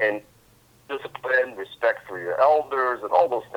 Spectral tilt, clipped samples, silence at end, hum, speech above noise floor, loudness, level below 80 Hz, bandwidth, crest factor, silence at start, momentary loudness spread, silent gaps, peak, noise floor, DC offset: -5 dB/octave; under 0.1%; 0 s; none; 33 dB; -23 LUFS; -68 dBFS; 19 kHz; 20 dB; 0 s; 14 LU; none; -4 dBFS; -57 dBFS; under 0.1%